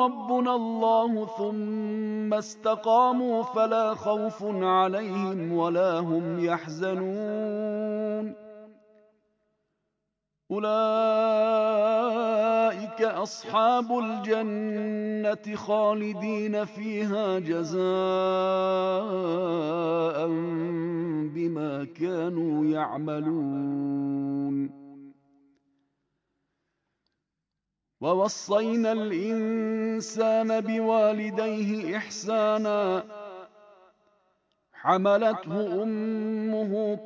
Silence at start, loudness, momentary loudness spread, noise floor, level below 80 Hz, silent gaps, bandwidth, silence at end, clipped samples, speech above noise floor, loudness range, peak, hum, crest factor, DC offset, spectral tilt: 0 s; -27 LUFS; 7 LU; -85 dBFS; -78 dBFS; none; 7.8 kHz; 0 s; under 0.1%; 59 dB; 7 LU; -8 dBFS; none; 18 dB; under 0.1%; -6 dB/octave